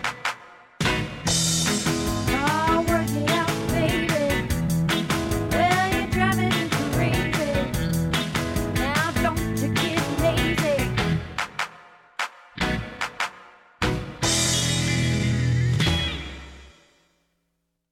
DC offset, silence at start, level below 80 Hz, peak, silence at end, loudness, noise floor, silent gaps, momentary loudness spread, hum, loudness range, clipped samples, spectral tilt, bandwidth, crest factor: under 0.1%; 0 s; -38 dBFS; -8 dBFS; 1.25 s; -23 LUFS; -76 dBFS; none; 9 LU; none; 3 LU; under 0.1%; -4 dB/octave; 17.5 kHz; 16 dB